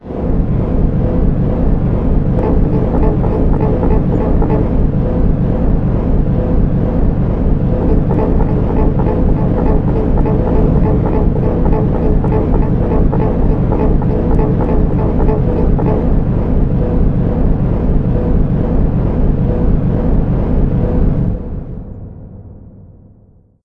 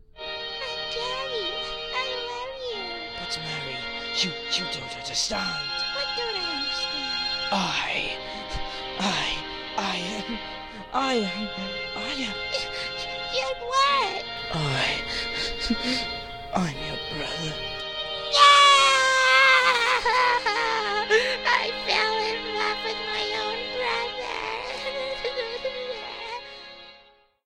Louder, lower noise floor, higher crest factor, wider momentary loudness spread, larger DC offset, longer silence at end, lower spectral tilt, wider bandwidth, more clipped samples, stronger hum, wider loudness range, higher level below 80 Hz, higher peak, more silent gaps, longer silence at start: first, -14 LUFS vs -24 LUFS; second, -46 dBFS vs -56 dBFS; second, 12 dB vs 26 dB; second, 2 LU vs 14 LU; neither; first, 0.85 s vs 0.5 s; first, -12 dB/octave vs -2 dB/octave; second, 3.7 kHz vs 16 kHz; neither; neither; second, 1 LU vs 11 LU; first, -16 dBFS vs -48 dBFS; about the same, 0 dBFS vs 0 dBFS; neither; about the same, 0.05 s vs 0.15 s